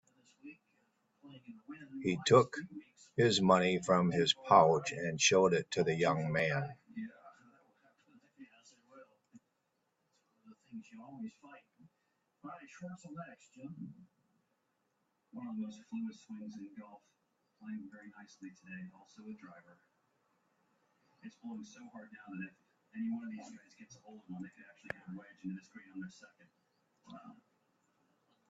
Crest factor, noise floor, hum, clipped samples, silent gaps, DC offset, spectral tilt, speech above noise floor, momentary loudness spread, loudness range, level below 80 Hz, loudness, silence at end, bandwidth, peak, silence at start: 28 dB; -82 dBFS; none; under 0.1%; none; under 0.1%; -4.5 dB/octave; 46 dB; 27 LU; 24 LU; -76 dBFS; -32 LUFS; 1.2 s; 8.2 kHz; -10 dBFS; 0.45 s